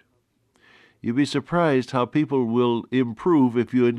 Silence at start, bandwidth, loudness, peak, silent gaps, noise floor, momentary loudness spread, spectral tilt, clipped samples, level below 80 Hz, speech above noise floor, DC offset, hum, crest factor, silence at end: 1.05 s; 10.5 kHz; -22 LUFS; -8 dBFS; none; -68 dBFS; 5 LU; -7 dB/octave; under 0.1%; -62 dBFS; 47 dB; under 0.1%; none; 14 dB; 0 s